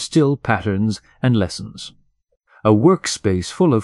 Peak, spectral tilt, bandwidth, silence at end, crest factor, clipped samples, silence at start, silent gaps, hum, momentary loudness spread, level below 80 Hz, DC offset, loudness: -2 dBFS; -6 dB/octave; 12 kHz; 0 s; 16 dB; under 0.1%; 0 s; none; none; 15 LU; -48 dBFS; under 0.1%; -18 LUFS